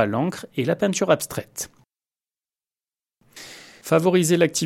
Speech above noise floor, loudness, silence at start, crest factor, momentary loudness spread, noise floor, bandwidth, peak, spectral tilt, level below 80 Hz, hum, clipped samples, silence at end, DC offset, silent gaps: over 69 dB; -22 LUFS; 0 s; 20 dB; 21 LU; under -90 dBFS; 16.5 kHz; -2 dBFS; -5 dB/octave; -64 dBFS; none; under 0.1%; 0 s; under 0.1%; none